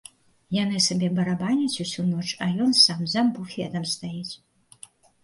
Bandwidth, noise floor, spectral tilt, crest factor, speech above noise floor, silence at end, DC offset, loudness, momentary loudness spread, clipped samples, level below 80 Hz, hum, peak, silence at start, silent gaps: 11.5 kHz; -51 dBFS; -4 dB/octave; 20 dB; 27 dB; 0.9 s; under 0.1%; -23 LUFS; 15 LU; under 0.1%; -64 dBFS; none; -4 dBFS; 0.5 s; none